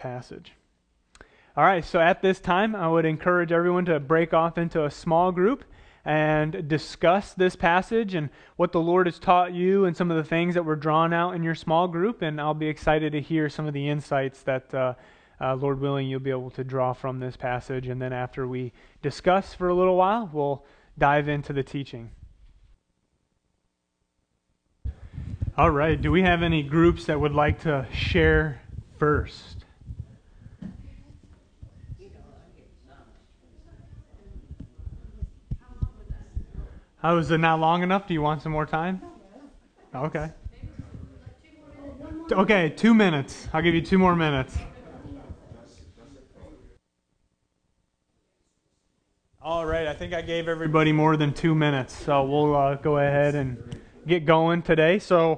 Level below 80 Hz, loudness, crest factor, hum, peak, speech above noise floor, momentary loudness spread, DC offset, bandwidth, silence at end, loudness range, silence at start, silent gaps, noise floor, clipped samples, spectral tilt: -44 dBFS; -24 LUFS; 22 dB; none; -4 dBFS; 54 dB; 21 LU; under 0.1%; 9.6 kHz; 0 s; 12 LU; 0 s; none; -77 dBFS; under 0.1%; -7 dB/octave